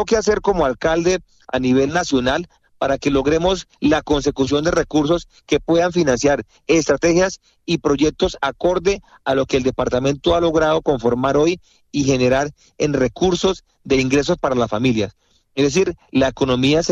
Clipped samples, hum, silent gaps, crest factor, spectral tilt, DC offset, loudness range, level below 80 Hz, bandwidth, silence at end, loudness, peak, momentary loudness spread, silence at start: under 0.1%; none; none; 14 dB; -5 dB/octave; under 0.1%; 1 LU; -38 dBFS; 8.4 kHz; 0 s; -18 LUFS; -4 dBFS; 6 LU; 0 s